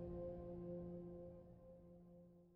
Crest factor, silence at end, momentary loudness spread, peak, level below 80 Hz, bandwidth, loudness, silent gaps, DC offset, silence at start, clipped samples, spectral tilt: 14 dB; 0 s; 13 LU; -40 dBFS; -66 dBFS; 3.3 kHz; -54 LUFS; none; under 0.1%; 0 s; under 0.1%; -11.5 dB/octave